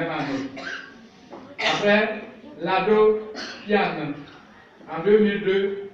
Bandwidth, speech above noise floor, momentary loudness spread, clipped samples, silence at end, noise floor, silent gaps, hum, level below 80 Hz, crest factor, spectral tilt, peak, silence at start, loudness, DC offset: 7.4 kHz; 27 dB; 17 LU; under 0.1%; 0.05 s; -48 dBFS; none; none; -58 dBFS; 18 dB; -5.5 dB/octave; -6 dBFS; 0 s; -22 LUFS; under 0.1%